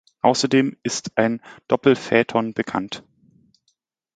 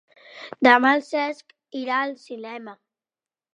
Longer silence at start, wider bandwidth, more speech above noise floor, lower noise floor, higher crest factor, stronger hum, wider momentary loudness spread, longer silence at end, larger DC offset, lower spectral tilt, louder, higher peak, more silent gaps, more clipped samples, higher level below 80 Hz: about the same, 0.25 s vs 0.35 s; about the same, 9.4 kHz vs 10 kHz; second, 50 dB vs over 68 dB; second, -71 dBFS vs under -90 dBFS; about the same, 22 dB vs 22 dB; neither; second, 10 LU vs 23 LU; first, 1.15 s vs 0.85 s; neither; about the same, -4.5 dB/octave vs -4 dB/octave; about the same, -21 LUFS vs -20 LUFS; about the same, 0 dBFS vs -2 dBFS; neither; neither; first, -62 dBFS vs -80 dBFS